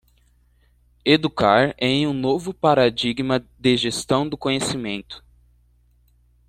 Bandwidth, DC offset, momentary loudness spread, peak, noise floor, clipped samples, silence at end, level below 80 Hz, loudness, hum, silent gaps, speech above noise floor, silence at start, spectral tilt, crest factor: 14.5 kHz; under 0.1%; 10 LU; -2 dBFS; -59 dBFS; under 0.1%; 1.3 s; -52 dBFS; -20 LUFS; 60 Hz at -50 dBFS; none; 39 dB; 1.05 s; -5 dB/octave; 20 dB